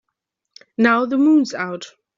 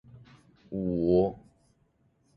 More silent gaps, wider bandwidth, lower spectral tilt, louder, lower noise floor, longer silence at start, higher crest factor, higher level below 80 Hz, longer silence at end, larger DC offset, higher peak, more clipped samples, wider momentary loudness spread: neither; first, 7.6 kHz vs 5 kHz; second, -5 dB/octave vs -11 dB/octave; first, -17 LUFS vs -28 LUFS; first, -79 dBFS vs -69 dBFS; first, 0.8 s vs 0.15 s; about the same, 16 dB vs 20 dB; second, -66 dBFS vs -54 dBFS; second, 0.3 s vs 1 s; neither; first, -2 dBFS vs -12 dBFS; neither; about the same, 16 LU vs 16 LU